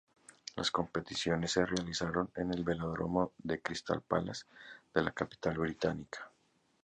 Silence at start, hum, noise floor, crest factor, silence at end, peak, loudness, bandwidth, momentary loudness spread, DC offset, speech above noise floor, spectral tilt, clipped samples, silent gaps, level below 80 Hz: 0.55 s; none; -74 dBFS; 22 dB; 0.55 s; -14 dBFS; -36 LUFS; 10 kHz; 13 LU; under 0.1%; 38 dB; -5 dB/octave; under 0.1%; none; -58 dBFS